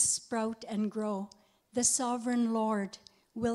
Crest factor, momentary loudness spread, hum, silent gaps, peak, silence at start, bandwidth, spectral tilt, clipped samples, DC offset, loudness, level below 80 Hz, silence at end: 18 dB; 14 LU; none; none; -14 dBFS; 0 s; 15 kHz; -3 dB/octave; under 0.1%; under 0.1%; -32 LUFS; -66 dBFS; 0 s